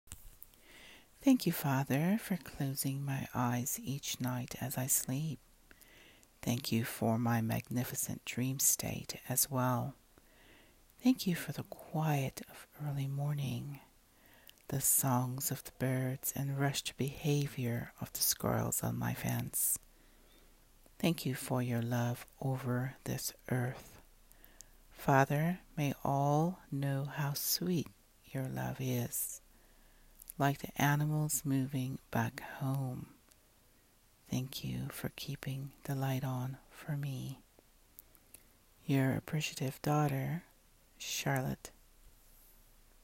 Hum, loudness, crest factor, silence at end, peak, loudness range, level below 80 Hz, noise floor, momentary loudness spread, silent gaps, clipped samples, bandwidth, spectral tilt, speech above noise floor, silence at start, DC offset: none; -35 LUFS; 22 dB; 0.95 s; -14 dBFS; 6 LU; -64 dBFS; -67 dBFS; 13 LU; none; under 0.1%; 16.5 kHz; -4.5 dB/octave; 32 dB; 0.05 s; under 0.1%